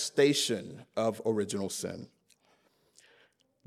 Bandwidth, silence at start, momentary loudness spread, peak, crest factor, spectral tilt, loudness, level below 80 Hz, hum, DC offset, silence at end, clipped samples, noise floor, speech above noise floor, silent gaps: 15 kHz; 0 s; 14 LU; -12 dBFS; 20 dB; -3.5 dB/octave; -31 LUFS; -78 dBFS; none; under 0.1%; 1.6 s; under 0.1%; -69 dBFS; 39 dB; none